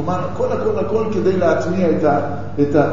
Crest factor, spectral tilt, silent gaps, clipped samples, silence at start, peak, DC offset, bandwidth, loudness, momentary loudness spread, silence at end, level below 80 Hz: 14 dB; -8 dB/octave; none; under 0.1%; 0 s; -2 dBFS; 4%; 7.4 kHz; -18 LUFS; 5 LU; 0 s; -44 dBFS